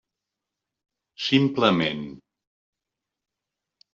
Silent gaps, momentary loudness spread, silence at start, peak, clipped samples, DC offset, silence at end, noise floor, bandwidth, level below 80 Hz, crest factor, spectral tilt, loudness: none; 14 LU; 1.2 s; -6 dBFS; under 0.1%; under 0.1%; 1.75 s; -86 dBFS; 7.4 kHz; -66 dBFS; 22 dB; -4 dB/octave; -22 LUFS